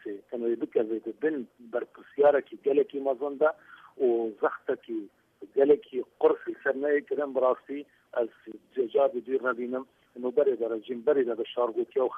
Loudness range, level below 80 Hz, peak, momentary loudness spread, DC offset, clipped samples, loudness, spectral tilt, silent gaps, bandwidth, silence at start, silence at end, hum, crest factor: 2 LU; -78 dBFS; -10 dBFS; 13 LU; under 0.1%; under 0.1%; -29 LUFS; -7.5 dB/octave; none; 3.7 kHz; 0.05 s; 0 s; none; 18 dB